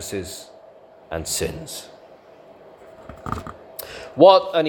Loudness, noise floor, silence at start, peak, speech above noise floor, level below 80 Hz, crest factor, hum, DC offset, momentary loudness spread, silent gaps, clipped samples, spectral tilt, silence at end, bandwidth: -19 LUFS; -47 dBFS; 0 s; 0 dBFS; 28 dB; -50 dBFS; 22 dB; 50 Hz at -60 dBFS; under 0.1%; 23 LU; none; under 0.1%; -4 dB/octave; 0 s; 18 kHz